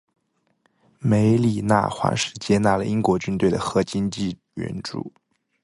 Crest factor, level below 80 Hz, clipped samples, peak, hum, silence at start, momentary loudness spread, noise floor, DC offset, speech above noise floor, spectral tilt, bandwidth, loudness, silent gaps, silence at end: 20 dB; -50 dBFS; under 0.1%; -4 dBFS; none; 1 s; 12 LU; -67 dBFS; under 0.1%; 46 dB; -6 dB/octave; 11.5 kHz; -22 LUFS; none; 0.55 s